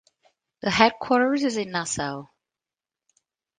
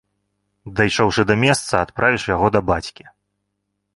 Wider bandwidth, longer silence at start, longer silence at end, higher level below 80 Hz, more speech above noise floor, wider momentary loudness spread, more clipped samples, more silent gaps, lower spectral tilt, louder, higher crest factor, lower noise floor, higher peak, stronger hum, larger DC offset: second, 9.8 kHz vs 11.5 kHz; about the same, 0.65 s vs 0.65 s; first, 1.35 s vs 1.05 s; second, -58 dBFS vs -42 dBFS; first, over 67 dB vs 57 dB; first, 12 LU vs 7 LU; neither; neither; second, -3.5 dB/octave vs -5 dB/octave; second, -23 LUFS vs -18 LUFS; about the same, 24 dB vs 20 dB; first, under -90 dBFS vs -75 dBFS; about the same, -2 dBFS vs 0 dBFS; second, none vs 50 Hz at -45 dBFS; neither